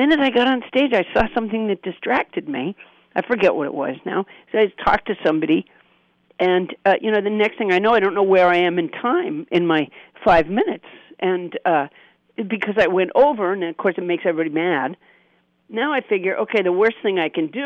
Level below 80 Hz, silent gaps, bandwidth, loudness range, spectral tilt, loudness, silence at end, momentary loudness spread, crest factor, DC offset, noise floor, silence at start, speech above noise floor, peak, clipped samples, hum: -48 dBFS; none; 7.4 kHz; 4 LU; -7 dB/octave; -19 LUFS; 0 s; 10 LU; 14 dB; under 0.1%; -61 dBFS; 0 s; 42 dB; -6 dBFS; under 0.1%; none